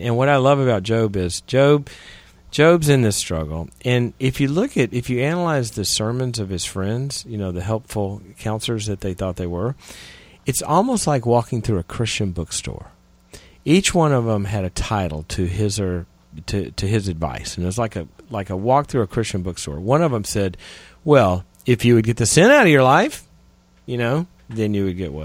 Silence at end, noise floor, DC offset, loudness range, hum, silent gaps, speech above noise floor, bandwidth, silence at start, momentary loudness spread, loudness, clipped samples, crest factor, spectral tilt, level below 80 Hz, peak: 0 s; -53 dBFS; under 0.1%; 8 LU; none; none; 34 dB; 16.5 kHz; 0 s; 13 LU; -20 LUFS; under 0.1%; 20 dB; -5 dB/octave; -40 dBFS; 0 dBFS